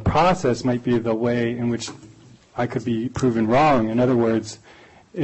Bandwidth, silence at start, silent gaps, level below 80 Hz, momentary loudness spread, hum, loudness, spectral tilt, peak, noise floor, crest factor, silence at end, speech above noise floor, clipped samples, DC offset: 8.4 kHz; 0 s; none; -42 dBFS; 15 LU; none; -21 LUFS; -6.5 dB/octave; -10 dBFS; -49 dBFS; 12 dB; 0 s; 28 dB; under 0.1%; under 0.1%